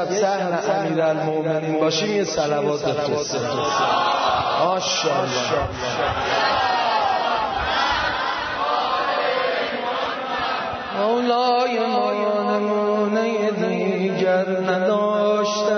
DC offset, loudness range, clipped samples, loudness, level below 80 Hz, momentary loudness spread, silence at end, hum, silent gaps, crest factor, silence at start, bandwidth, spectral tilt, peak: under 0.1%; 1 LU; under 0.1%; -21 LUFS; -48 dBFS; 4 LU; 0 s; none; none; 14 dB; 0 s; 6.6 kHz; -4 dB/octave; -6 dBFS